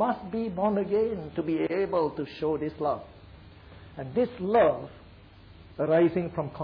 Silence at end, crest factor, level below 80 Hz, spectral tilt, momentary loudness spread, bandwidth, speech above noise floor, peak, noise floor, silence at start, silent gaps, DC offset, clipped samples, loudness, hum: 0 s; 16 dB; -56 dBFS; -10 dB/octave; 13 LU; 5.2 kHz; 24 dB; -14 dBFS; -51 dBFS; 0 s; none; under 0.1%; under 0.1%; -28 LUFS; none